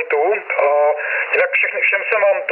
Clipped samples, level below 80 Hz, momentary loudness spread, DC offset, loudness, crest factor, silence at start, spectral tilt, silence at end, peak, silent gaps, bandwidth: under 0.1%; -84 dBFS; 3 LU; under 0.1%; -16 LUFS; 12 dB; 0 s; -5 dB/octave; 0 s; -4 dBFS; none; 4.4 kHz